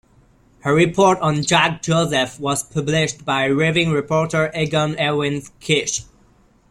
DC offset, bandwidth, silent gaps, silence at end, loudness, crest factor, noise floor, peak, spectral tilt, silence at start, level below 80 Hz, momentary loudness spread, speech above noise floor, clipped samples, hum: under 0.1%; 14 kHz; none; 0.7 s; -18 LUFS; 18 dB; -54 dBFS; -2 dBFS; -4.5 dB/octave; 0.65 s; -50 dBFS; 7 LU; 36 dB; under 0.1%; none